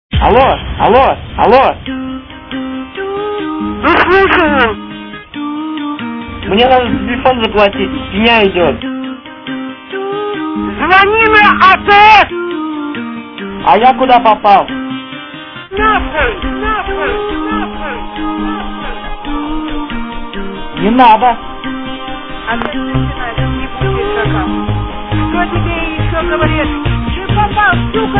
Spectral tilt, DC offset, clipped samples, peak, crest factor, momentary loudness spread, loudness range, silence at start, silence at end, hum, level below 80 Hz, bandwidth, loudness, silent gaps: -7.5 dB/octave; 0.5%; 0.8%; 0 dBFS; 12 dB; 16 LU; 8 LU; 0.1 s; 0 s; none; -26 dBFS; 5.4 kHz; -11 LUFS; none